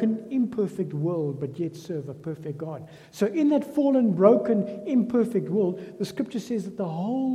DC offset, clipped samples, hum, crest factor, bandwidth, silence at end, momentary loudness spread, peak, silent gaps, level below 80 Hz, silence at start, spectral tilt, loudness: under 0.1%; under 0.1%; none; 20 dB; 14 kHz; 0 s; 14 LU; -4 dBFS; none; -70 dBFS; 0 s; -8 dB/octave; -26 LUFS